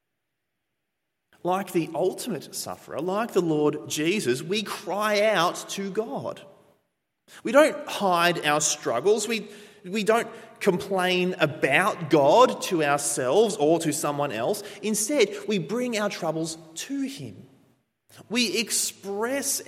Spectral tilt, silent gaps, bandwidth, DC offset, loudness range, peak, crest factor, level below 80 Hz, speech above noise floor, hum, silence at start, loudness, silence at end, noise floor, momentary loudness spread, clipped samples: -3.5 dB/octave; none; 16.5 kHz; under 0.1%; 7 LU; -4 dBFS; 22 dB; -74 dBFS; 57 dB; none; 1.45 s; -24 LUFS; 0.05 s; -82 dBFS; 11 LU; under 0.1%